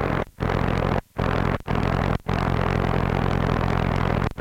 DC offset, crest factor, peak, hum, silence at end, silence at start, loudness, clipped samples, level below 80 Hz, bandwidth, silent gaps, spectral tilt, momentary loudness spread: under 0.1%; 14 dB; -8 dBFS; none; 0 s; 0 s; -24 LUFS; under 0.1%; -32 dBFS; 10.5 kHz; none; -7.5 dB/octave; 3 LU